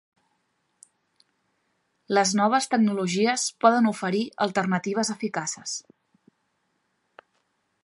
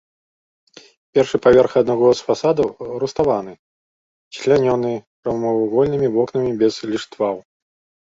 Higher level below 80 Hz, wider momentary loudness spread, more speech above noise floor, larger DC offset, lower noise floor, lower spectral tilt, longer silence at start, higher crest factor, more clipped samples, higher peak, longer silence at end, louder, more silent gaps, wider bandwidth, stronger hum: second, -76 dBFS vs -52 dBFS; second, 9 LU vs 12 LU; second, 50 dB vs over 73 dB; neither; second, -74 dBFS vs under -90 dBFS; second, -4 dB/octave vs -6.5 dB/octave; first, 2.1 s vs 1.15 s; about the same, 22 dB vs 18 dB; neither; about the same, -4 dBFS vs -2 dBFS; first, 2.05 s vs 0.7 s; second, -24 LUFS vs -18 LUFS; second, none vs 3.59-4.31 s, 5.07-5.23 s; first, 11.5 kHz vs 7.8 kHz; neither